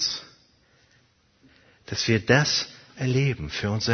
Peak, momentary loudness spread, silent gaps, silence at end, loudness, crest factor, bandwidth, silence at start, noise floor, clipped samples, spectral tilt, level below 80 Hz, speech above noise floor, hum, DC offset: -2 dBFS; 13 LU; none; 0 s; -24 LUFS; 24 dB; 6.6 kHz; 0 s; -63 dBFS; under 0.1%; -4.5 dB/octave; -52 dBFS; 39 dB; none; under 0.1%